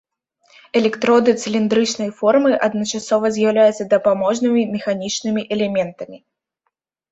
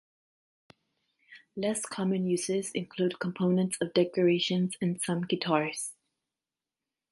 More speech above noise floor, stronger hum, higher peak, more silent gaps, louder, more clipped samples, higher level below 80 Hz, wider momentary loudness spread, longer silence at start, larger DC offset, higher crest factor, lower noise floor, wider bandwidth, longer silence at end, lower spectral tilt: second, 57 dB vs over 61 dB; neither; first, -2 dBFS vs -10 dBFS; neither; first, -18 LUFS vs -30 LUFS; neither; first, -62 dBFS vs -74 dBFS; about the same, 7 LU vs 8 LU; second, 0.75 s vs 1.3 s; neither; about the same, 16 dB vs 20 dB; second, -74 dBFS vs under -90 dBFS; second, 8.2 kHz vs 11.5 kHz; second, 0.95 s vs 1.2 s; about the same, -4.5 dB/octave vs -5 dB/octave